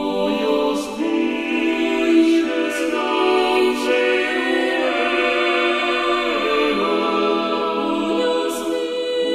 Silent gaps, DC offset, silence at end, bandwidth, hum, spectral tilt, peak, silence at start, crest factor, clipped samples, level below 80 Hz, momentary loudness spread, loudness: none; under 0.1%; 0 s; 14.5 kHz; none; -3.5 dB/octave; -4 dBFS; 0 s; 14 dB; under 0.1%; -52 dBFS; 5 LU; -19 LUFS